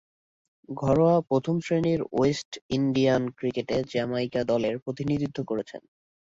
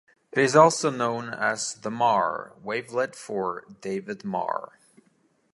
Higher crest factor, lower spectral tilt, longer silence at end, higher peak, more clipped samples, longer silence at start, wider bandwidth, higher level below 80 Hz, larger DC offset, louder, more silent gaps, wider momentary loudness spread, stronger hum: second, 16 dB vs 22 dB; first, -7 dB/octave vs -4 dB/octave; second, 0.6 s vs 0.9 s; second, -10 dBFS vs -4 dBFS; neither; first, 0.7 s vs 0.35 s; second, 7.8 kHz vs 11.5 kHz; first, -56 dBFS vs -70 dBFS; neither; about the same, -26 LUFS vs -25 LUFS; first, 2.45-2.52 s, 2.62-2.69 s, 4.82-4.86 s vs none; second, 10 LU vs 15 LU; neither